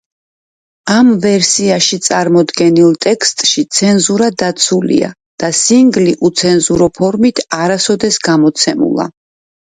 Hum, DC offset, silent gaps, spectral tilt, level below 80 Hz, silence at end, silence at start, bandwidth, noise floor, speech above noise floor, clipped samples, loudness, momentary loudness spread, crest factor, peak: none; under 0.1%; 5.26-5.38 s; -3.5 dB/octave; -48 dBFS; 0.65 s; 0.85 s; 9.6 kHz; under -90 dBFS; over 80 dB; under 0.1%; -11 LUFS; 6 LU; 12 dB; 0 dBFS